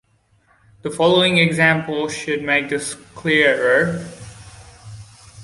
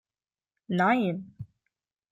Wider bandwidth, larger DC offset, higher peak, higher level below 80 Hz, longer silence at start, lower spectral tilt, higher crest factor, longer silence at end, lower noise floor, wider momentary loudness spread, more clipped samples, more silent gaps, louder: first, 11.5 kHz vs 7.6 kHz; neither; first, -2 dBFS vs -12 dBFS; first, -52 dBFS vs -70 dBFS; first, 0.85 s vs 0.7 s; second, -4.5 dB/octave vs -7.5 dB/octave; about the same, 18 dB vs 20 dB; second, 0 s vs 0.65 s; second, -59 dBFS vs under -90 dBFS; second, 16 LU vs 23 LU; neither; neither; first, -17 LUFS vs -27 LUFS